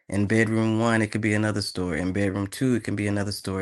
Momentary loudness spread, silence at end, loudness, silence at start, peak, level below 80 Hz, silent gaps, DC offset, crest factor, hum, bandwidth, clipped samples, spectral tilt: 6 LU; 0 s; -25 LUFS; 0.1 s; -6 dBFS; -56 dBFS; none; under 0.1%; 18 dB; none; 12.5 kHz; under 0.1%; -6 dB/octave